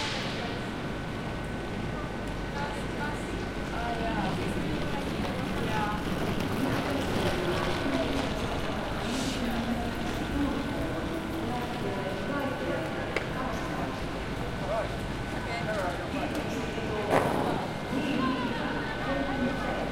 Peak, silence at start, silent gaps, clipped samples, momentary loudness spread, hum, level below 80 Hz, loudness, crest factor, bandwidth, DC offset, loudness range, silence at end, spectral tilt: -8 dBFS; 0 s; none; under 0.1%; 5 LU; none; -42 dBFS; -31 LUFS; 24 dB; 16 kHz; under 0.1%; 3 LU; 0 s; -5.5 dB/octave